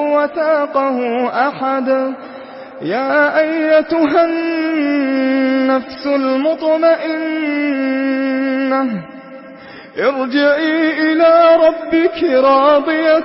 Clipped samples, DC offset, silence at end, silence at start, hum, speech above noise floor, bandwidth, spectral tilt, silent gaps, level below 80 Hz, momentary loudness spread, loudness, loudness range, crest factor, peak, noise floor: under 0.1%; under 0.1%; 0 s; 0 s; none; 22 dB; 5.8 kHz; -9 dB/octave; none; -60 dBFS; 13 LU; -14 LUFS; 5 LU; 12 dB; -2 dBFS; -35 dBFS